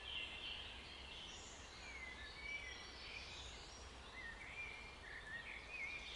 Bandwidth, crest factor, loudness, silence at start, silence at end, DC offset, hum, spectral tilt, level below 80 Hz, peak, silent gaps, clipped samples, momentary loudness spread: 11.5 kHz; 16 dB; -50 LUFS; 0 s; 0 s; under 0.1%; none; -2 dB/octave; -62 dBFS; -36 dBFS; none; under 0.1%; 7 LU